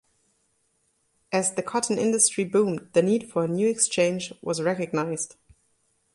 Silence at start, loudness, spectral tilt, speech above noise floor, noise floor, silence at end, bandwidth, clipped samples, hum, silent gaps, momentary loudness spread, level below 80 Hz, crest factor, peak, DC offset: 1.3 s; -24 LUFS; -4 dB/octave; 46 dB; -70 dBFS; 0.9 s; 11.5 kHz; under 0.1%; none; none; 9 LU; -68 dBFS; 20 dB; -6 dBFS; under 0.1%